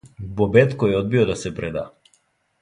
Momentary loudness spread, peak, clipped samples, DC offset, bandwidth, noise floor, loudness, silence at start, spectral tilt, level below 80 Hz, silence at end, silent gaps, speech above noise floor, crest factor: 15 LU; 0 dBFS; under 0.1%; under 0.1%; 11 kHz; -64 dBFS; -20 LUFS; 0.05 s; -7 dB/octave; -46 dBFS; 0.75 s; none; 45 dB; 20 dB